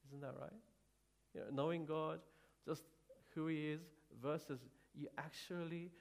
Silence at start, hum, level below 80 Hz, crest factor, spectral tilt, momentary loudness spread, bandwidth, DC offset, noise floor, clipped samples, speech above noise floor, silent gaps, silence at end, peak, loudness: 0.05 s; none; -82 dBFS; 20 dB; -6.5 dB/octave; 15 LU; 15.5 kHz; under 0.1%; -79 dBFS; under 0.1%; 32 dB; none; 0 s; -28 dBFS; -47 LUFS